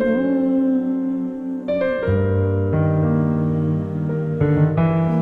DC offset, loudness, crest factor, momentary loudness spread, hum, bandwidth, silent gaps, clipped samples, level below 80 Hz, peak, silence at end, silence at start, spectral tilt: under 0.1%; -20 LUFS; 12 dB; 6 LU; none; 4.4 kHz; none; under 0.1%; -44 dBFS; -6 dBFS; 0 s; 0 s; -11 dB/octave